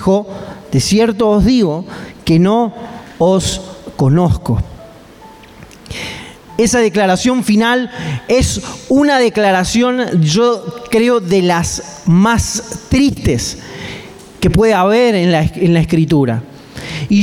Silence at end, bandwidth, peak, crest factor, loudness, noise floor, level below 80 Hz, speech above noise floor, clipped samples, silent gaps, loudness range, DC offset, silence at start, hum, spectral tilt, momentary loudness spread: 0 s; 16 kHz; -2 dBFS; 10 dB; -13 LUFS; -38 dBFS; -32 dBFS; 25 dB; under 0.1%; none; 4 LU; under 0.1%; 0 s; none; -5.5 dB/octave; 15 LU